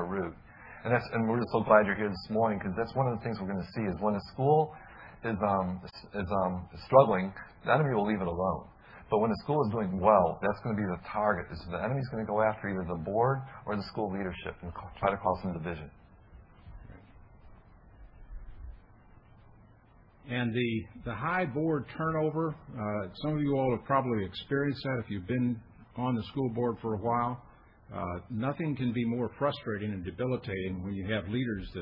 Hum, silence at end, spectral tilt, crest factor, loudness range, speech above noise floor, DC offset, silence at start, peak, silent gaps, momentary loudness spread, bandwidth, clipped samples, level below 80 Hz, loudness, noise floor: none; 0 s; -10 dB/octave; 24 dB; 7 LU; 28 dB; under 0.1%; 0 s; -8 dBFS; none; 13 LU; 5.6 kHz; under 0.1%; -56 dBFS; -31 LUFS; -59 dBFS